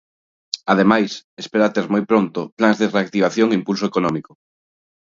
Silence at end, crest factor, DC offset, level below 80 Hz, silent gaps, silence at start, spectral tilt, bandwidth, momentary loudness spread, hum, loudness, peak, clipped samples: 0.85 s; 20 dB; under 0.1%; -62 dBFS; 1.24-1.37 s, 2.52-2.57 s; 0.55 s; -6 dB/octave; 7.6 kHz; 9 LU; none; -18 LUFS; 0 dBFS; under 0.1%